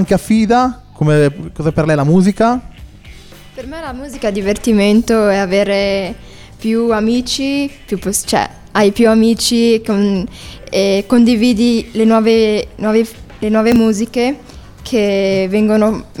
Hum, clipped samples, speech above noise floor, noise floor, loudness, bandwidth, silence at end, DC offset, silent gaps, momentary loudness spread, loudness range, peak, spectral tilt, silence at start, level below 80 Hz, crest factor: none; under 0.1%; 23 dB; -36 dBFS; -13 LUFS; 15.5 kHz; 0 s; under 0.1%; none; 11 LU; 3 LU; 0 dBFS; -5.5 dB/octave; 0 s; -38 dBFS; 12 dB